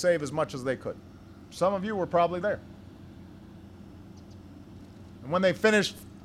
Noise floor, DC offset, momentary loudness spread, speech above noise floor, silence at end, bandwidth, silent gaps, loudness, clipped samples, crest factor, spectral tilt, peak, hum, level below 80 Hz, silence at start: -48 dBFS; under 0.1%; 25 LU; 21 dB; 0 s; 15 kHz; none; -28 LUFS; under 0.1%; 20 dB; -5 dB/octave; -10 dBFS; none; -60 dBFS; 0 s